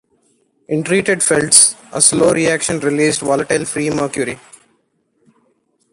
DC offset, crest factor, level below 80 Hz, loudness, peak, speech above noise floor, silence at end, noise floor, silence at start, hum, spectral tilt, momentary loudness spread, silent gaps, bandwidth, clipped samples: under 0.1%; 16 dB; -52 dBFS; -14 LUFS; 0 dBFS; 48 dB; 1.55 s; -63 dBFS; 0.7 s; none; -2.5 dB/octave; 13 LU; none; 16 kHz; under 0.1%